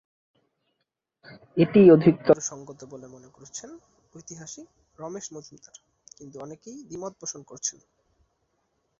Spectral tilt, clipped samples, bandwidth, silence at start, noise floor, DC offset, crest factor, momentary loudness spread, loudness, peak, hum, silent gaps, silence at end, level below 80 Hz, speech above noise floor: -6 dB/octave; under 0.1%; 7.8 kHz; 1.55 s; -81 dBFS; under 0.1%; 22 dB; 27 LU; -21 LUFS; -4 dBFS; none; none; 1.3 s; -64 dBFS; 56 dB